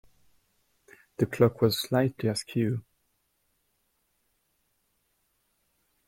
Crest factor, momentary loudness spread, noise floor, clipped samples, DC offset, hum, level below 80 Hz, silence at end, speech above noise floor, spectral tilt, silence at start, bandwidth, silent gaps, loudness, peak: 22 dB; 8 LU; -74 dBFS; under 0.1%; under 0.1%; none; -64 dBFS; 3.25 s; 48 dB; -6 dB/octave; 1.2 s; 16.5 kHz; none; -27 LUFS; -10 dBFS